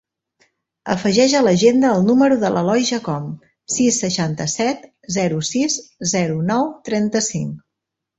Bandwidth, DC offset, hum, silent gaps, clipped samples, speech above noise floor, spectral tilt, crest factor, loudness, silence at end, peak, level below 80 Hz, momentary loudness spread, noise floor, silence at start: 8.2 kHz; under 0.1%; none; none; under 0.1%; 64 dB; -4.5 dB/octave; 16 dB; -18 LUFS; 0.6 s; -2 dBFS; -56 dBFS; 13 LU; -81 dBFS; 0.85 s